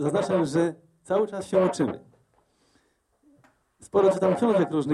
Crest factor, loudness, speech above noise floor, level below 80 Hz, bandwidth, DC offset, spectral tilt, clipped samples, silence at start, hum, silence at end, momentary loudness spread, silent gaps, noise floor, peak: 16 dB; -24 LUFS; 44 dB; -64 dBFS; 12 kHz; under 0.1%; -6.5 dB/octave; under 0.1%; 0 s; none; 0 s; 7 LU; none; -67 dBFS; -10 dBFS